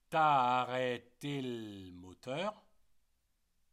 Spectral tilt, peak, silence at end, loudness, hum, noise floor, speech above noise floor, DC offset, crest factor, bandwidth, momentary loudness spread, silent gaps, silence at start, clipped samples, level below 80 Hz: -5.5 dB/octave; -18 dBFS; 1.2 s; -35 LUFS; none; -77 dBFS; 43 dB; under 0.1%; 18 dB; 13.5 kHz; 20 LU; none; 0.1 s; under 0.1%; -76 dBFS